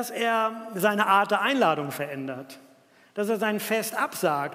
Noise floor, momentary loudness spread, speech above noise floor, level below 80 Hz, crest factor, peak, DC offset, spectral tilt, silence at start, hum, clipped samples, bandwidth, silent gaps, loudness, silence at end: -57 dBFS; 14 LU; 32 dB; -82 dBFS; 20 dB; -8 dBFS; under 0.1%; -4 dB/octave; 0 s; none; under 0.1%; 16 kHz; none; -25 LUFS; 0 s